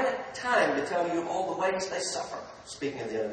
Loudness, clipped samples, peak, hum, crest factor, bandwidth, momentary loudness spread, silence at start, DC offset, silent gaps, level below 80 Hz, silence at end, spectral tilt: -30 LUFS; under 0.1%; -12 dBFS; none; 20 dB; 9.8 kHz; 11 LU; 0 s; under 0.1%; none; -66 dBFS; 0 s; -3 dB/octave